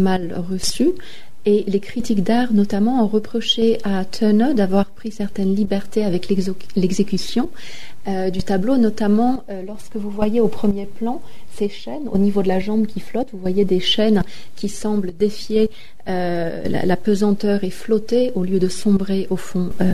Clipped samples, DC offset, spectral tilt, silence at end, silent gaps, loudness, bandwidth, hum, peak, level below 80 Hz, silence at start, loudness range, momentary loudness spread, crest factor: under 0.1%; 7%; -6 dB/octave; 0 s; none; -20 LUFS; 13.5 kHz; none; -6 dBFS; -44 dBFS; 0 s; 4 LU; 10 LU; 14 dB